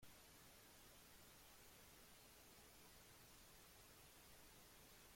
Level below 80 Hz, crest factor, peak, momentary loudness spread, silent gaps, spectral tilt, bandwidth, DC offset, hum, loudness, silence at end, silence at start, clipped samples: -76 dBFS; 14 dB; -52 dBFS; 0 LU; none; -2 dB/octave; 16.5 kHz; under 0.1%; none; -65 LUFS; 0 s; 0 s; under 0.1%